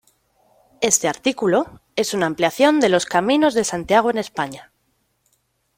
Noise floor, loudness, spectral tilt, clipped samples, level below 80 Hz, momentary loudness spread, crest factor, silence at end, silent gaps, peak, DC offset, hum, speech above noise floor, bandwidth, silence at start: -67 dBFS; -19 LUFS; -3 dB/octave; under 0.1%; -58 dBFS; 10 LU; 18 dB; 1.15 s; none; -2 dBFS; under 0.1%; none; 49 dB; 16.5 kHz; 0.8 s